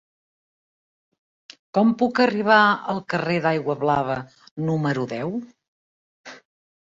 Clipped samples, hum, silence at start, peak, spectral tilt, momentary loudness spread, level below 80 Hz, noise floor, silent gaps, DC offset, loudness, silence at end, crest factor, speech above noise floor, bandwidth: under 0.1%; none; 1.75 s; -2 dBFS; -7 dB/octave; 13 LU; -62 dBFS; under -90 dBFS; 4.51-4.56 s, 5.68-6.24 s; under 0.1%; -21 LUFS; 0.55 s; 22 dB; over 69 dB; 7.8 kHz